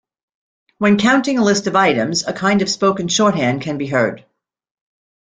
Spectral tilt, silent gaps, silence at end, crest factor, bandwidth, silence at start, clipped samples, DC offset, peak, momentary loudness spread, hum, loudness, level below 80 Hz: -4.5 dB/octave; none; 1.1 s; 16 dB; 9.4 kHz; 0.8 s; under 0.1%; under 0.1%; -2 dBFS; 5 LU; none; -16 LUFS; -56 dBFS